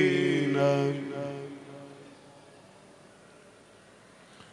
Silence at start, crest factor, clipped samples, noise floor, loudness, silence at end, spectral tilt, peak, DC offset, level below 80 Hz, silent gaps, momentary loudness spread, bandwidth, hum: 0 s; 22 dB; under 0.1%; -55 dBFS; -28 LUFS; 0.1 s; -6.5 dB/octave; -10 dBFS; under 0.1%; -74 dBFS; none; 26 LU; 12 kHz; none